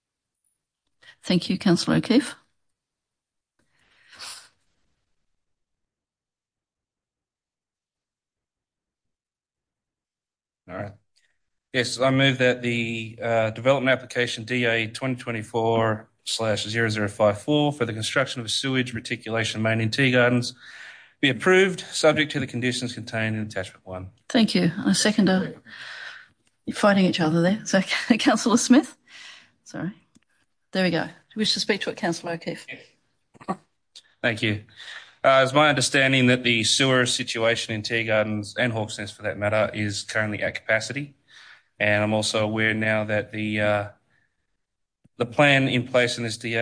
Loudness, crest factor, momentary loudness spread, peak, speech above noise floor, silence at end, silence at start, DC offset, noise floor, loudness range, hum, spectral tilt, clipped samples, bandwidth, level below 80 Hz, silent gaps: -22 LUFS; 20 dB; 18 LU; -4 dBFS; over 67 dB; 0 s; 1.25 s; under 0.1%; under -90 dBFS; 6 LU; none; -4.5 dB/octave; under 0.1%; 10.5 kHz; -64 dBFS; none